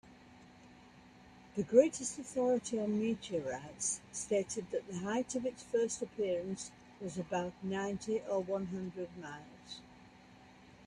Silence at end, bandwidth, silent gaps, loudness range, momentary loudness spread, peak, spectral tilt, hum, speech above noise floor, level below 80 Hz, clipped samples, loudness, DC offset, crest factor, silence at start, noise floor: 0 s; 11.5 kHz; none; 6 LU; 13 LU; -14 dBFS; -4.5 dB/octave; none; 23 dB; -70 dBFS; under 0.1%; -36 LUFS; under 0.1%; 24 dB; 0.05 s; -59 dBFS